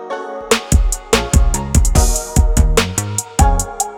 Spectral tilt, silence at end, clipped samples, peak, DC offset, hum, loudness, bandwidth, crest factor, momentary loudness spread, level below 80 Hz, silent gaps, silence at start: -4 dB/octave; 0 s; under 0.1%; 0 dBFS; under 0.1%; none; -16 LUFS; 18.5 kHz; 14 dB; 5 LU; -16 dBFS; none; 0 s